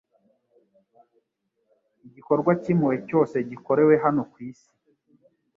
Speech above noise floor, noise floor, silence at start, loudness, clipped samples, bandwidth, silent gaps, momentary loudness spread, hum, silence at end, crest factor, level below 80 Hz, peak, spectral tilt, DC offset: 53 dB; -76 dBFS; 2.05 s; -22 LUFS; under 0.1%; 7.2 kHz; none; 15 LU; none; 1.05 s; 20 dB; -68 dBFS; -6 dBFS; -10 dB/octave; under 0.1%